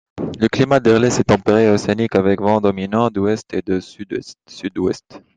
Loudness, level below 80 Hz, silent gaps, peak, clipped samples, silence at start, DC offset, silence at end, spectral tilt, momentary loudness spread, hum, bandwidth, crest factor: -17 LUFS; -50 dBFS; none; 0 dBFS; under 0.1%; 0.15 s; under 0.1%; 0.2 s; -6 dB/octave; 14 LU; none; 9.4 kHz; 16 dB